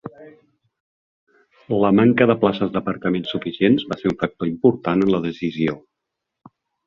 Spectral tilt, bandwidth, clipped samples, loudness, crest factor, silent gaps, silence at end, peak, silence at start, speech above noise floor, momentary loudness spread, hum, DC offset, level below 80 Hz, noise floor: -8.5 dB/octave; 7 kHz; under 0.1%; -20 LUFS; 20 dB; 0.80-1.27 s; 1.1 s; -2 dBFS; 0.05 s; 62 dB; 10 LU; none; under 0.1%; -54 dBFS; -81 dBFS